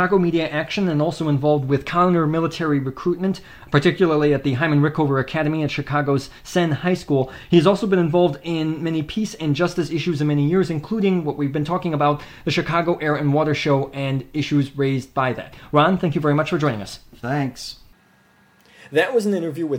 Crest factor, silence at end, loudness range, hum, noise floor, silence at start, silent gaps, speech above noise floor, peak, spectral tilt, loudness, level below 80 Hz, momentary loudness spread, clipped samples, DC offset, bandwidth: 18 dB; 0 s; 2 LU; none; -56 dBFS; 0 s; none; 36 dB; -2 dBFS; -7 dB/octave; -20 LUFS; -50 dBFS; 7 LU; under 0.1%; under 0.1%; 16 kHz